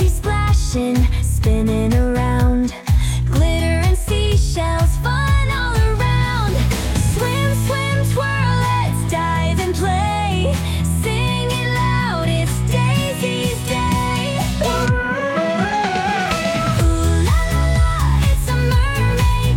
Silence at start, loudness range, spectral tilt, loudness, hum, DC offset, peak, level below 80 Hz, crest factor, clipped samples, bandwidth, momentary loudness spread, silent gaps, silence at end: 0 s; 1 LU; -5.5 dB/octave; -18 LUFS; none; under 0.1%; -6 dBFS; -22 dBFS; 12 dB; under 0.1%; 17 kHz; 2 LU; none; 0 s